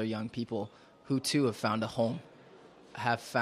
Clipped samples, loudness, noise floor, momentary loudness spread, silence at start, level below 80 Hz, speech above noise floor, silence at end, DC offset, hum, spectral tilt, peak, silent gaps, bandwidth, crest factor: under 0.1%; -33 LUFS; -56 dBFS; 12 LU; 0 s; -72 dBFS; 23 dB; 0 s; under 0.1%; none; -5 dB/octave; -12 dBFS; none; 14.5 kHz; 20 dB